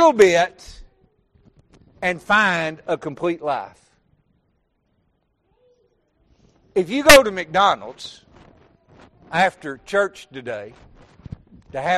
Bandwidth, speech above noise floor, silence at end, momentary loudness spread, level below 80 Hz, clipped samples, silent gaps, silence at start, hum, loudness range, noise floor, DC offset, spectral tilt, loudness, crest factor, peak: 13 kHz; 49 dB; 0 s; 25 LU; -46 dBFS; under 0.1%; none; 0 s; none; 13 LU; -67 dBFS; under 0.1%; -3 dB/octave; -18 LUFS; 22 dB; 0 dBFS